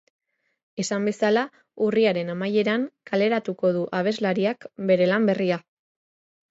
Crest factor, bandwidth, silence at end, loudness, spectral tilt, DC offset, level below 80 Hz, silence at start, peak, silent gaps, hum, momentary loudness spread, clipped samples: 16 dB; 8 kHz; 0.9 s; -24 LUFS; -5.5 dB/octave; under 0.1%; -72 dBFS; 0.75 s; -8 dBFS; none; none; 7 LU; under 0.1%